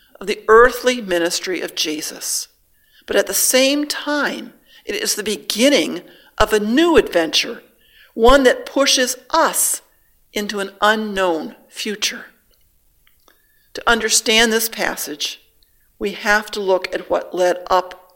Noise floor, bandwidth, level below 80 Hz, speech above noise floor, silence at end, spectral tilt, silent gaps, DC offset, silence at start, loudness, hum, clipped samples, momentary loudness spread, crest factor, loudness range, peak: -57 dBFS; 17 kHz; -40 dBFS; 40 dB; 0.2 s; -1.5 dB/octave; none; under 0.1%; 0.2 s; -17 LUFS; none; under 0.1%; 13 LU; 18 dB; 6 LU; 0 dBFS